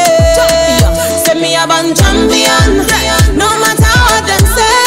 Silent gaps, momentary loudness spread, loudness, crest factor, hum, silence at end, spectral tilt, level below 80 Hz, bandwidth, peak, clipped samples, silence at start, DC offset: none; 3 LU; -8 LUFS; 8 dB; none; 0 s; -3.5 dB/octave; -16 dBFS; 16.5 kHz; 0 dBFS; 0.2%; 0 s; 0.1%